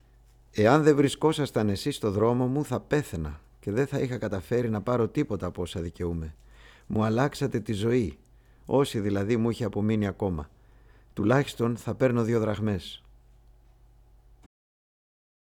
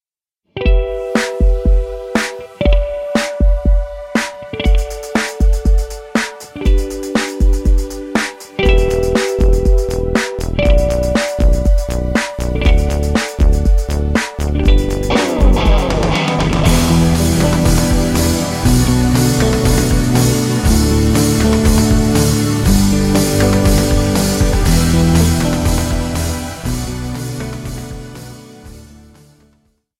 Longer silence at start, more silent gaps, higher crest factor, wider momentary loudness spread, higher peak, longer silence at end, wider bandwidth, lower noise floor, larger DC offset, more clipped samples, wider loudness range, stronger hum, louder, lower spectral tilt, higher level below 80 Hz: about the same, 0.55 s vs 0.55 s; neither; first, 22 dB vs 14 dB; first, 11 LU vs 8 LU; second, -6 dBFS vs 0 dBFS; first, 2.5 s vs 1.2 s; about the same, 17.5 kHz vs 16 kHz; second, -57 dBFS vs -72 dBFS; neither; neither; about the same, 5 LU vs 5 LU; neither; second, -27 LUFS vs -15 LUFS; first, -7 dB/octave vs -5.5 dB/octave; second, -50 dBFS vs -16 dBFS